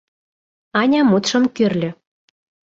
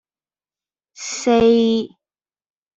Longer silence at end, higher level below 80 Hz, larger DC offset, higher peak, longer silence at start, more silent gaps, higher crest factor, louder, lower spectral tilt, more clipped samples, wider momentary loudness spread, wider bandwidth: about the same, 0.8 s vs 0.9 s; second, -60 dBFS vs -50 dBFS; neither; about the same, -4 dBFS vs -4 dBFS; second, 0.75 s vs 1 s; neither; about the same, 16 dB vs 16 dB; about the same, -17 LUFS vs -17 LUFS; about the same, -5 dB/octave vs -4.5 dB/octave; neither; second, 9 LU vs 18 LU; about the same, 7.8 kHz vs 8 kHz